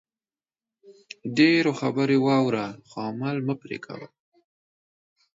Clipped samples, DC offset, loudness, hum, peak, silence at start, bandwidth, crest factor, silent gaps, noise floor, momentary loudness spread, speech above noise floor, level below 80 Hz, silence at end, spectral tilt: under 0.1%; under 0.1%; -24 LUFS; none; -6 dBFS; 0.9 s; 7.8 kHz; 20 dB; none; under -90 dBFS; 18 LU; over 66 dB; -72 dBFS; 1.35 s; -6.5 dB/octave